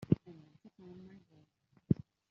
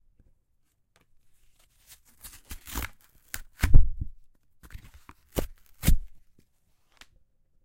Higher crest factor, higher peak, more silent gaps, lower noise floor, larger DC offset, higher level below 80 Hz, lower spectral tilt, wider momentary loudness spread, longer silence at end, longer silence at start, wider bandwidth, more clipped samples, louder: about the same, 26 dB vs 24 dB; second, -12 dBFS vs -2 dBFS; neither; about the same, -70 dBFS vs -70 dBFS; neither; second, -66 dBFS vs -28 dBFS; first, -11.5 dB/octave vs -5 dB/octave; second, 23 LU vs 28 LU; second, 0.35 s vs 1.65 s; second, 0.1 s vs 2.5 s; second, 5.8 kHz vs 16.5 kHz; neither; second, -36 LUFS vs -32 LUFS